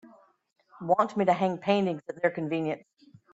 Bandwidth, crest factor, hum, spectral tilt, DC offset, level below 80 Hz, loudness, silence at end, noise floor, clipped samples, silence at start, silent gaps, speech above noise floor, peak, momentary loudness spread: 8 kHz; 18 dB; none; -7 dB/octave; under 0.1%; -74 dBFS; -28 LUFS; 0.55 s; -56 dBFS; under 0.1%; 0.05 s; none; 29 dB; -10 dBFS; 8 LU